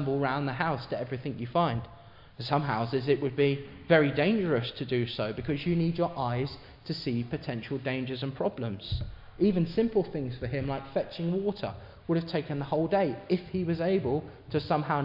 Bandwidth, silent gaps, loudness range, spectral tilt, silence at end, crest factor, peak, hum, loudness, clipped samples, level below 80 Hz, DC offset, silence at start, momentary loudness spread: 5.6 kHz; none; 4 LU; -9 dB/octave; 0 s; 20 dB; -8 dBFS; none; -30 LUFS; under 0.1%; -54 dBFS; under 0.1%; 0 s; 9 LU